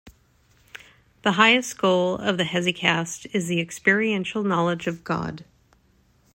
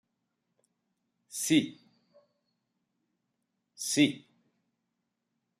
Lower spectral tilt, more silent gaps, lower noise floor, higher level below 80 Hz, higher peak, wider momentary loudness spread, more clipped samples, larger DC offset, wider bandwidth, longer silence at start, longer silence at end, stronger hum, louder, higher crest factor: about the same, -4.5 dB/octave vs -3.5 dB/octave; neither; second, -61 dBFS vs -83 dBFS; first, -60 dBFS vs -78 dBFS; first, -2 dBFS vs -12 dBFS; second, 11 LU vs 15 LU; neither; neither; about the same, 16 kHz vs 15 kHz; second, 0.05 s vs 1.3 s; second, 0.95 s vs 1.4 s; neither; first, -22 LUFS vs -28 LUFS; about the same, 22 dB vs 24 dB